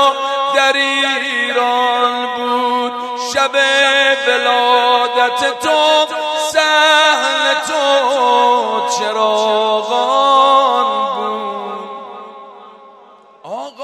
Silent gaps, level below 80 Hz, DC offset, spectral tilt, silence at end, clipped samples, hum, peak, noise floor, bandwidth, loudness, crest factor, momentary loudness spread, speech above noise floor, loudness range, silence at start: none; -68 dBFS; under 0.1%; -0.5 dB/octave; 0 s; under 0.1%; none; 0 dBFS; -43 dBFS; 14.5 kHz; -13 LUFS; 14 dB; 11 LU; 30 dB; 3 LU; 0 s